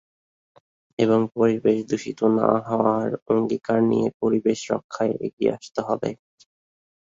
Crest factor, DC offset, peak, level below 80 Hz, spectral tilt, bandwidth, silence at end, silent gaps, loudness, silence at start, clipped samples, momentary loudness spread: 20 dB; under 0.1%; -4 dBFS; -62 dBFS; -7 dB/octave; 7.8 kHz; 1.05 s; 3.22-3.26 s, 4.14-4.20 s, 4.84-4.89 s, 5.33-5.37 s; -23 LUFS; 1 s; under 0.1%; 8 LU